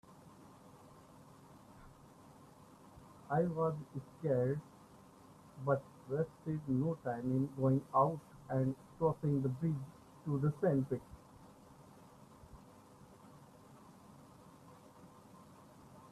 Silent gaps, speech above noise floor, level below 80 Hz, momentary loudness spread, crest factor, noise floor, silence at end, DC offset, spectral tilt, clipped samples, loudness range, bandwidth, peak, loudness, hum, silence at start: none; 24 dB; -70 dBFS; 26 LU; 20 dB; -60 dBFS; 0.05 s; under 0.1%; -9.5 dB/octave; under 0.1%; 23 LU; 13.5 kHz; -20 dBFS; -37 LUFS; none; 0.1 s